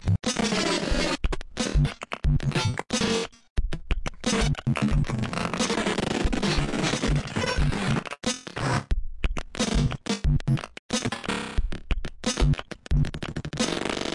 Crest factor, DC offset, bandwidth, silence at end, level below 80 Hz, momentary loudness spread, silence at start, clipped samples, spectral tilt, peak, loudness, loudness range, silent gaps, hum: 14 dB; under 0.1%; 11.5 kHz; 0 s; -32 dBFS; 8 LU; 0 s; under 0.1%; -4.5 dB/octave; -12 dBFS; -27 LUFS; 2 LU; 3.50-3.56 s, 10.79-10.89 s; none